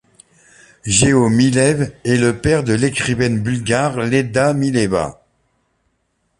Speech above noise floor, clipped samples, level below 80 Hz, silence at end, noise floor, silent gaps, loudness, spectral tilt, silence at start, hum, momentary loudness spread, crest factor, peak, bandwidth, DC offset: 51 dB; under 0.1%; -42 dBFS; 1.25 s; -67 dBFS; none; -16 LUFS; -5 dB/octave; 0.85 s; none; 6 LU; 16 dB; 0 dBFS; 11.5 kHz; under 0.1%